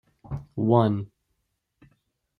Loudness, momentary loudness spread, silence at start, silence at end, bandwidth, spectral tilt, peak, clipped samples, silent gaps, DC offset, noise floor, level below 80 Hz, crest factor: -24 LUFS; 17 LU; 0.3 s; 1.35 s; 4.6 kHz; -10.5 dB/octave; -6 dBFS; under 0.1%; none; under 0.1%; -77 dBFS; -56 dBFS; 22 dB